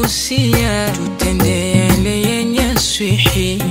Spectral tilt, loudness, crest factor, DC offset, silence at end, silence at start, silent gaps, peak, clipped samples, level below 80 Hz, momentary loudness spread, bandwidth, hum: -4.5 dB/octave; -14 LUFS; 14 dB; under 0.1%; 0 s; 0 s; none; 0 dBFS; under 0.1%; -26 dBFS; 4 LU; 16.5 kHz; none